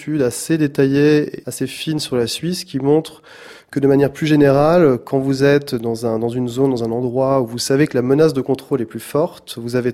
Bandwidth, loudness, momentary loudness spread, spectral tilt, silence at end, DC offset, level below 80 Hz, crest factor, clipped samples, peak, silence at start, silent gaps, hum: 15.5 kHz; -17 LUFS; 9 LU; -6 dB/octave; 0 s; under 0.1%; -52 dBFS; 14 dB; under 0.1%; -2 dBFS; 0 s; none; none